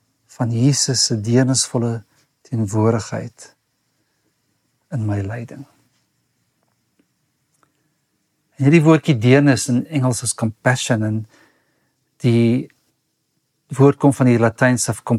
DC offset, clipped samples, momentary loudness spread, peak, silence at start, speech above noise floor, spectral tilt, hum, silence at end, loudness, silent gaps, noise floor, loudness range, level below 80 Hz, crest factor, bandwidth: under 0.1%; under 0.1%; 16 LU; -2 dBFS; 0.4 s; 53 dB; -5.5 dB/octave; none; 0 s; -17 LUFS; none; -70 dBFS; 14 LU; -62 dBFS; 18 dB; 13.5 kHz